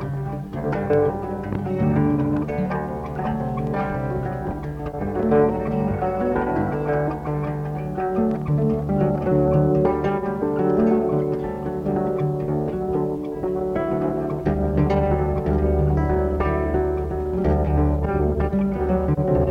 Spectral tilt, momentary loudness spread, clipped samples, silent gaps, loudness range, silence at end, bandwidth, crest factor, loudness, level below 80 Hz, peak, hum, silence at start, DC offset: -10 dB/octave; 8 LU; under 0.1%; none; 3 LU; 0 s; 5.8 kHz; 16 dB; -22 LUFS; -32 dBFS; -6 dBFS; none; 0 s; under 0.1%